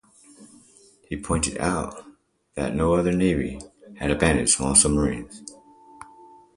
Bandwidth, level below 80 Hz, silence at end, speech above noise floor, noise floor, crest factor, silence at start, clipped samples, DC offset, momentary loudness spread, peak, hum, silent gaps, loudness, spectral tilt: 11.5 kHz; -40 dBFS; 0.55 s; 32 dB; -55 dBFS; 24 dB; 0.4 s; under 0.1%; under 0.1%; 23 LU; 0 dBFS; none; none; -22 LUFS; -4 dB/octave